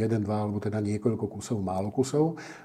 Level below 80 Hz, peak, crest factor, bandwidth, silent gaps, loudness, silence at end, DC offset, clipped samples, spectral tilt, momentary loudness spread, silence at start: -66 dBFS; -12 dBFS; 16 dB; 13.5 kHz; none; -29 LUFS; 0 s; under 0.1%; under 0.1%; -7 dB/octave; 5 LU; 0 s